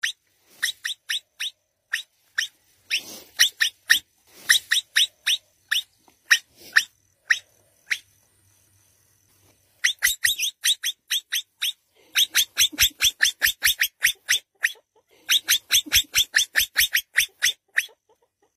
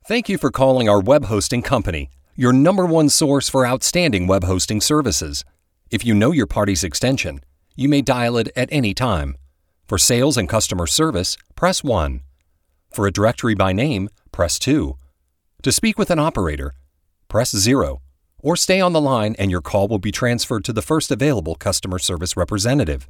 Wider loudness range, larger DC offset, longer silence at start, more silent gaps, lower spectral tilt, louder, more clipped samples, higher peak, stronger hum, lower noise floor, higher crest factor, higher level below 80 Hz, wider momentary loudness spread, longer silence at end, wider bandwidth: about the same, 6 LU vs 4 LU; neither; about the same, 0.05 s vs 0.05 s; neither; second, 3 dB/octave vs -4.5 dB/octave; second, -22 LUFS vs -18 LUFS; neither; about the same, -2 dBFS vs 0 dBFS; neither; about the same, -65 dBFS vs -65 dBFS; first, 24 dB vs 18 dB; second, -56 dBFS vs -36 dBFS; about the same, 11 LU vs 10 LU; first, 0.7 s vs 0.05 s; second, 16 kHz vs 18.5 kHz